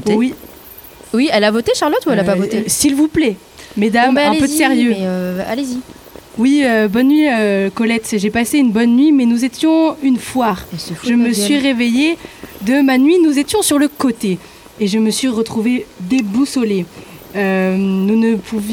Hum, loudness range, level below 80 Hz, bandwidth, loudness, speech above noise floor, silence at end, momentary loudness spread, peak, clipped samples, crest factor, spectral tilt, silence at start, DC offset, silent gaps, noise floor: none; 3 LU; -48 dBFS; 18 kHz; -14 LUFS; 23 dB; 0 s; 11 LU; 0 dBFS; under 0.1%; 14 dB; -4.5 dB/octave; 0 s; under 0.1%; none; -37 dBFS